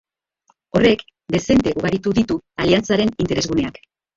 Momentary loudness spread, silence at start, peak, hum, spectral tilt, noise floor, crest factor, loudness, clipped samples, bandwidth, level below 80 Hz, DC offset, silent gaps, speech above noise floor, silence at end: 7 LU; 0.75 s; -2 dBFS; none; -5.5 dB/octave; -63 dBFS; 18 dB; -19 LUFS; under 0.1%; 7.8 kHz; -42 dBFS; under 0.1%; none; 45 dB; 0.45 s